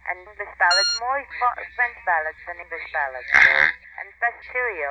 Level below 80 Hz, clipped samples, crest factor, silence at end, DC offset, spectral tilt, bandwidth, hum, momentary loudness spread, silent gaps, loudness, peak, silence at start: -56 dBFS; under 0.1%; 20 dB; 0 s; under 0.1%; 0 dB/octave; 10.5 kHz; none; 18 LU; none; -20 LUFS; -2 dBFS; 0.05 s